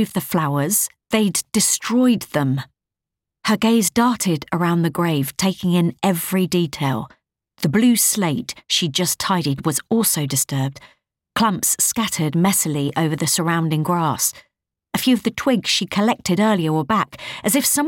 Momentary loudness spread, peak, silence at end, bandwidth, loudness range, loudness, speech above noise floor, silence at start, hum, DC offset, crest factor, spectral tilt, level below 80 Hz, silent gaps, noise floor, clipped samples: 5 LU; -6 dBFS; 0 s; 17 kHz; 1 LU; -19 LUFS; 66 dB; 0 s; none; under 0.1%; 14 dB; -4 dB/octave; -56 dBFS; none; -85 dBFS; under 0.1%